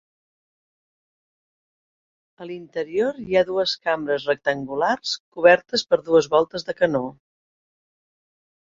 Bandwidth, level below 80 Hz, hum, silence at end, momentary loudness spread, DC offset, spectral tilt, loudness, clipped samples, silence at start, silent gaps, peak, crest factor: 7.6 kHz; -62 dBFS; none; 1.55 s; 13 LU; under 0.1%; -4 dB/octave; -21 LUFS; under 0.1%; 2.4 s; 5.20-5.32 s; -2 dBFS; 22 dB